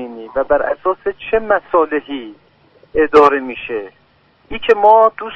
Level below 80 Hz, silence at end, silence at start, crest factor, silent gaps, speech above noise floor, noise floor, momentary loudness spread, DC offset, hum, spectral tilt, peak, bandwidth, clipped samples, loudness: -44 dBFS; 0 s; 0 s; 16 dB; none; 39 dB; -53 dBFS; 15 LU; under 0.1%; none; -5.5 dB/octave; 0 dBFS; 6.6 kHz; under 0.1%; -14 LUFS